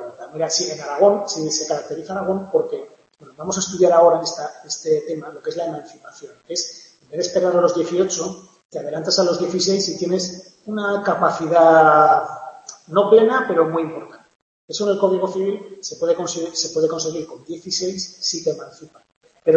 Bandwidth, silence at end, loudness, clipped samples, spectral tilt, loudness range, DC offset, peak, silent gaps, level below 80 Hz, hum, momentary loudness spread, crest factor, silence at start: 8.6 kHz; 0 s; -19 LUFS; under 0.1%; -3.5 dB/octave; 7 LU; under 0.1%; 0 dBFS; 8.65-8.70 s, 14.42-14.68 s, 19.16-19.21 s; -66 dBFS; none; 17 LU; 18 dB; 0 s